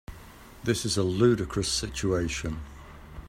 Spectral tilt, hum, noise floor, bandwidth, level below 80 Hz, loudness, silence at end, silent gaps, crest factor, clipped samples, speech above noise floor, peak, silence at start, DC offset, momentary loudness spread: -4.5 dB/octave; none; -48 dBFS; 16 kHz; -44 dBFS; -27 LUFS; 0 s; none; 20 dB; under 0.1%; 21 dB; -10 dBFS; 0.1 s; under 0.1%; 23 LU